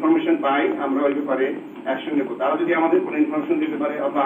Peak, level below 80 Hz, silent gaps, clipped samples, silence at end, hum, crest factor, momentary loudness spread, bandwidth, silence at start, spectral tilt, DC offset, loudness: -8 dBFS; -78 dBFS; none; under 0.1%; 0 s; none; 14 dB; 6 LU; 3.8 kHz; 0 s; -7.5 dB/octave; under 0.1%; -21 LUFS